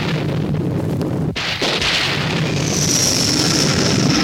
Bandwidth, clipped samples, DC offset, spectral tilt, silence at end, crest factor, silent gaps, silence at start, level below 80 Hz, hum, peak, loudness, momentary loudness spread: 17 kHz; under 0.1%; under 0.1%; -3.5 dB/octave; 0 s; 14 dB; none; 0 s; -40 dBFS; none; -2 dBFS; -16 LUFS; 7 LU